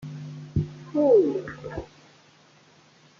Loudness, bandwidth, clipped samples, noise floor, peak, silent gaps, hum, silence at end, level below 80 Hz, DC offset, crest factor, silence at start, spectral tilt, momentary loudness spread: -24 LUFS; 7.2 kHz; under 0.1%; -56 dBFS; -8 dBFS; none; none; 1.35 s; -52 dBFS; under 0.1%; 18 dB; 0 s; -9 dB/octave; 19 LU